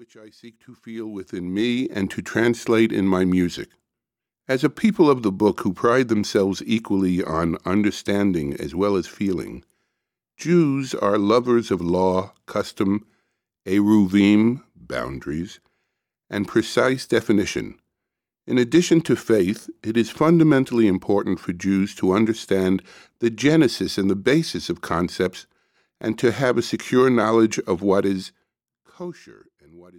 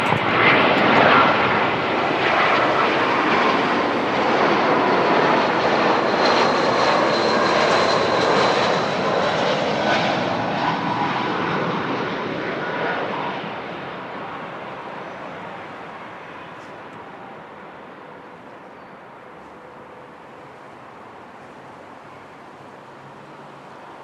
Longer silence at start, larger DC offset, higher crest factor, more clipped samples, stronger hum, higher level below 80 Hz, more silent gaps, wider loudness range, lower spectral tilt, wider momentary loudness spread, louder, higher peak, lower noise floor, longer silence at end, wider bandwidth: about the same, 0 s vs 0 s; neither; about the same, 16 dB vs 20 dB; neither; neither; first, -54 dBFS vs -60 dBFS; neither; second, 3 LU vs 23 LU; first, -6 dB/octave vs -4.5 dB/octave; second, 13 LU vs 24 LU; second, -21 LUFS vs -18 LUFS; second, -6 dBFS vs -2 dBFS; first, -87 dBFS vs -41 dBFS; first, 0.2 s vs 0 s; first, 15.5 kHz vs 11.5 kHz